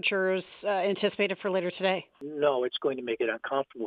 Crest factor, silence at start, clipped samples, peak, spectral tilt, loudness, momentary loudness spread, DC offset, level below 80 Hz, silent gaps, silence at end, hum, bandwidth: 16 dB; 0.05 s; under 0.1%; -12 dBFS; -7.5 dB/octave; -29 LUFS; 5 LU; under 0.1%; -78 dBFS; none; 0 s; none; 5 kHz